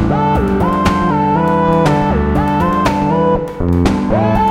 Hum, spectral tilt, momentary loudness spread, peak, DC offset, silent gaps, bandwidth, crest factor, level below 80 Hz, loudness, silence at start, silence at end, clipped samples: none; -7.5 dB/octave; 2 LU; 0 dBFS; under 0.1%; none; 15.5 kHz; 12 dB; -26 dBFS; -14 LUFS; 0 s; 0 s; under 0.1%